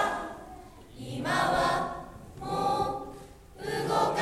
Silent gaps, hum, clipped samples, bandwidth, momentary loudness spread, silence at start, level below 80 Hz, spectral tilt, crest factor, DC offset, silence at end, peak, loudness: none; none; under 0.1%; 16 kHz; 21 LU; 0 s; -52 dBFS; -4.5 dB/octave; 18 dB; under 0.1%; 0 s; -14 dBFS; -30 LUFS